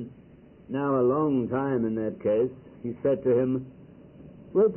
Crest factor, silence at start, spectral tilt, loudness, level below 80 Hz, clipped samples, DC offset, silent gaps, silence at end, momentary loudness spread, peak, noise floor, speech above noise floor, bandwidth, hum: 14 dB; 0 s; -12.5 dB/octave; -27 LUFS; -60 dBFS; under 0.1%; under 0.1%; none; 0 s; 13 LU; -14 dBFS; -52 dBFS; 26 dB; 3.2 kHz; none